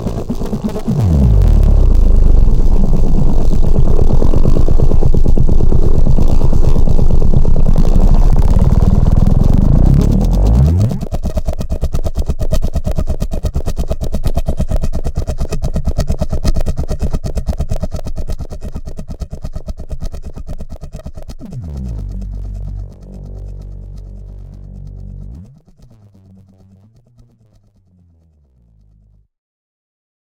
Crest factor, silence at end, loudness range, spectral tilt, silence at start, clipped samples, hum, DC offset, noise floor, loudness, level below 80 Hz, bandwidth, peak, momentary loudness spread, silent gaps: 10 dB; 4.85 s; 17 LU; -8.5 dB/octave; 0 s; under 0.1%; none; under 0.1%; -51 dBFS; -16 LUFS; -12 dBFS; 7.4 kHz; 0 dBFS; 19 LU; none